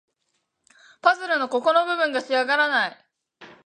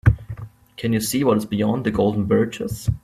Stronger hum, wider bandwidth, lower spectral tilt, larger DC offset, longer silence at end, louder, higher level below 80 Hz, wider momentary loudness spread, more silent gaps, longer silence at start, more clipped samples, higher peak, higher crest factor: neither; second, 10 kHz vs 16 kHz; second, -2.5 dB/octave vs -6.5 dB/octave; neither; first, 0.2 s vs 0.05 s; about the same, -22 LUFS vs -21 LUFS; second, -82 dBFS vs -36 dBFS; second, 4 LU vs 12 LU; neither; first, 1.05 s vs 0.05 s; neither; about the same, -2 dBFS vs -2 dBFS; about the same, 22 dB vs 18 dB